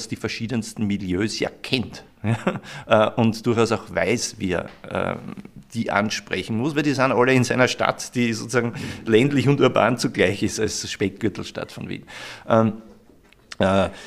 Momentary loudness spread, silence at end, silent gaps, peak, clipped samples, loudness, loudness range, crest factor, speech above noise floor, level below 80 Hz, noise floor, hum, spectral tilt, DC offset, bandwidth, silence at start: 15 LU; 0 s; none; 0 dBFS; under 0.1%; -22 LUFS; 5 LU; 22 dB; 31 dB; -54 dBFS; -53 dBFS; none; -5 dB/octave; under 0.1%; 15 kHz; 0 s